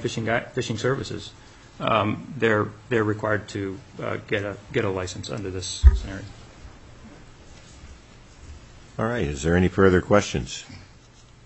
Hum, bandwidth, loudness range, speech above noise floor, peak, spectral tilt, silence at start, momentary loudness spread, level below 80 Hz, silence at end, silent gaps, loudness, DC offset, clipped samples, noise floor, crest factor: none; 8.4 kHz; 5 LU; 27 dB; -2 dBFS; -5.5 dB/octave; 0 s; 20 LU; -32 dBFS; 0.6 s; none; -24 LUFS; under 0.1%; under 0.1%; -50 dBFS; 24 dB